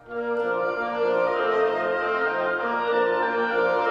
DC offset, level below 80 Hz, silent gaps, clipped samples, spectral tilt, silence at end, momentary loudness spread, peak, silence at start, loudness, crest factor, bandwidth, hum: under 0.1%; -62 dBFS; none; under 0.1%; -5.5 dB/octave; 0 s; 3 LU; -10 dBFS; 0.05 s; -24 LUFS; 12 dB; 6.8 kHz; none